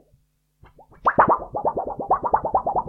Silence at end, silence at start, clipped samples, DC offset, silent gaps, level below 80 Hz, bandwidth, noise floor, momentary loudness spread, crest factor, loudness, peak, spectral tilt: 0 s; 1.05 s; under 0.1%; under 0.1%; none; -48 dBFS; 5.4 kHz; -63 dBFS; 7 LU; 22 dB; -22 LUFS; 0 dBFS; -9.5 dB/octave